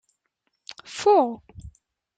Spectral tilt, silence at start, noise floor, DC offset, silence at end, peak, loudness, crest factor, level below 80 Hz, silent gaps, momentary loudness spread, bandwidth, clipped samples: -4.5 dB/octave; 0.9 s; -76 dBFS; under 0.1%; 0.5 s; -8 dBFS; -21 LUFS; 18 dB; -56 dBFS; none; 24 LU; 9.2 kHz; under 0.1%